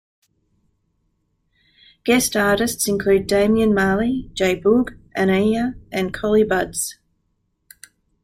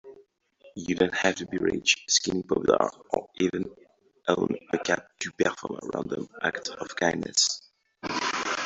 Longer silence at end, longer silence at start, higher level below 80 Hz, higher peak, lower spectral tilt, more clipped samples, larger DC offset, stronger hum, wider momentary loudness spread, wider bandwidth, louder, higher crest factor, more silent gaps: first, 1.3 s vs 0 s; first, 2.05 s vs 0.05 s; first, -44 dBFS vs -62 dBFS; about the same, -4 dBFS vs -6 dBFS; first, -4.5 dB/octave vs -2.5 dB/octave; neither; neither; neither; second, 8 LU vs 11 LU; first, 16 kHz vs 8.2 kHz; first, -19 LUFS vs -27 LUFS; second, 18 dB vs 24 dB; neither